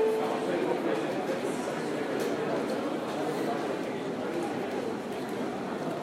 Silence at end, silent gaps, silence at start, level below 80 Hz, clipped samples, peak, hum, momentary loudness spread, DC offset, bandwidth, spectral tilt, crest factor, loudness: 0 s; none; 0 s; -70 dBFS; under 0.1%; -16 dBFS; none; 4 LU; under 0.1%; 16 kHz; -5.5 dB/octave; 14 dB; -32 LUFS